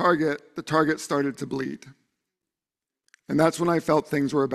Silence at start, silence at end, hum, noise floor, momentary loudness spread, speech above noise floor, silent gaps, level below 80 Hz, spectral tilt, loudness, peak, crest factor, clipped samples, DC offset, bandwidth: 0 s; 0 s; none; -90 dBFS; 10 LU; 66 dB; none; -62 dBFS; -6 dB/octave; -25 LUFS; -6 dBFS; 20 dB; under 0.1%; under 0.1%; 14 kHz